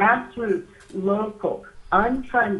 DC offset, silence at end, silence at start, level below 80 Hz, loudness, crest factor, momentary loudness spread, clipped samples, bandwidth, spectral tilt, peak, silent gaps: under 0.1%; 0 s; 0 s; -46 dBFS; -24 LUFS; 20 dB; 8 LU; under 0.1%; 11.5 kHz; -7.5 dB/octave; -4 dBFS; none